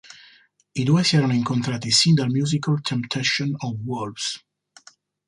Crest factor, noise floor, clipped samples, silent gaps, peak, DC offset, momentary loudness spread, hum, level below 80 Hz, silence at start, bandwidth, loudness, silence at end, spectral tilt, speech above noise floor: 18 dB; -55 dBFS; under 0.1%; none; -4 dBFS; under 0.1%; 11 LU; 50 Hz at -40 dBFS; -60 dBFS; 0.1 s; 11.5 kHz; -21 LUFS; 0.9 s; -4.5 dB/octave; 34 dB